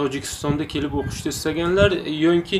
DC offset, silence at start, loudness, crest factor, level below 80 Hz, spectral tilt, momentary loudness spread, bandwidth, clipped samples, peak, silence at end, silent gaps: under 0.1%; 0 s; -22 LUFS; 18 dB; -40 dBFS; -5 dB/octave; 8 LU; 15.5 kHz; under 0.1%; -4 dBFS; 0 s; none